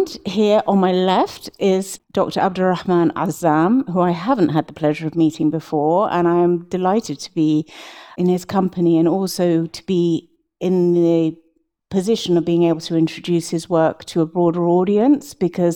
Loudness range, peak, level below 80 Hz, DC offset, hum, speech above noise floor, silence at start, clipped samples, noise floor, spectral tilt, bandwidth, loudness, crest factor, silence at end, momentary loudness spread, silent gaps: 1 LU; -2 dBFS; -58 dBFS; under 0.1%; none; 27 dB; 0 s; under 0.1%; -44 dBFS; -6.5 dB/octave; 16.5 kHz; -18 LUFS; 16 dB; 0 s; 6 LU; none